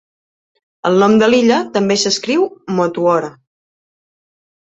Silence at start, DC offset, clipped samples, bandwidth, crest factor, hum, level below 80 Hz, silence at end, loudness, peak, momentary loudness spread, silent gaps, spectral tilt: 0.85 s; under 0.1%; under 0.1%; 8.2 kHz; 14 dB; none; -58 dBFS; 1.35 s; -14 LUFS; -2 dBFS; 8 LU; none; -4.5 dB/octave